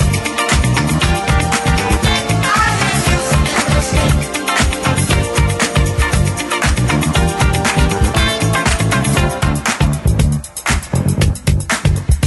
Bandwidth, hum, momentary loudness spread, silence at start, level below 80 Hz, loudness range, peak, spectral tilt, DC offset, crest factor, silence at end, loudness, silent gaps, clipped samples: 12.5 kHz; none; 3 LU; 0 s; -20 dBFS; 1 LU; -2 dBFS; -4.5 dB/octave; under 0.1%; 12 dB; 0 s; -14 LUFS; none; under 0.1%